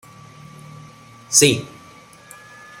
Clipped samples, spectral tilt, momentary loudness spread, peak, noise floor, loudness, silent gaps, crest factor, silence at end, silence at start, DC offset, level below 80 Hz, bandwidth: under 0.1%; -2.5 dB/octave; 27 LU; 0 dBFS; -45 dBFS; -15 LUFS; none; 24 dB; 1.15 s; 1.3 s; under 0.1%; -58 dBFS; 16.5 kHz